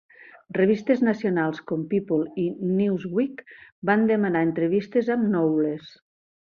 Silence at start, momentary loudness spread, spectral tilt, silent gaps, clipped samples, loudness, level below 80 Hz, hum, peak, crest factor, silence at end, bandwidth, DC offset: 0.5 s; 8 LU; -9 dB/octave; 3.72-3.82 s; under 0.1%; -24 LUFS; -68 dBFS; none; -6 dBFS; 18 dB; 0.65 s; 6.8 kHz; under 0.1%